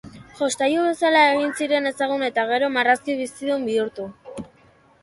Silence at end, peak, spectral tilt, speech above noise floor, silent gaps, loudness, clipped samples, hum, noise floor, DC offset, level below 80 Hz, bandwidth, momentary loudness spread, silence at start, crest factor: 0.55 s; -2 dBFS; -3 dB/octave; 34 dB; none; -21 LUFS; under 0.1%; none; -55 dBFS; under 0.1%; -62 dBFS; 11.5 kHz; 17 LU; 0.05 s; 20 dB